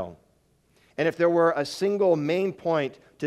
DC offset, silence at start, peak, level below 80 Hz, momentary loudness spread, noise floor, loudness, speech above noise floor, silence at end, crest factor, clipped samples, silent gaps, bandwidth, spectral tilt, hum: under 0.1%; 0 s; -8 dBFS; -70 dBFS; 11 LU; -65 dBFS; -24 LUFS; 41 dB; 0 s; 16 dB; under 0.1%; none; 13.5 kHz; -6 dB/octave; none